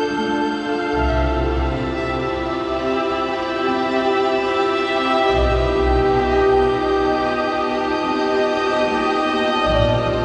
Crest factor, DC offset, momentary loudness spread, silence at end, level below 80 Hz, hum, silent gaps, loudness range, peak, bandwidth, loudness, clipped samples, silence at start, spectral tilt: 14 dB; under 0.1%; 5 LU; 0 s; -30 dBFS; none; none; 3 LU; -4 dBFS; 9 kHz; -19 LUFS; under 0.1%; 0 s; -6 dB/octave